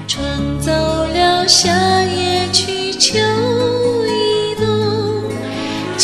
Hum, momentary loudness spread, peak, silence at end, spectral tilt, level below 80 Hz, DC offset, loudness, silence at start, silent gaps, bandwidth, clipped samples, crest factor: none; 10 LU; 0 dBFS; 0 s; -3.5 dB/octave; -36 dBFS; under 0.1%; -15 LUFS; 0 s; none; 15 kHz; under 0.1%; 16 dB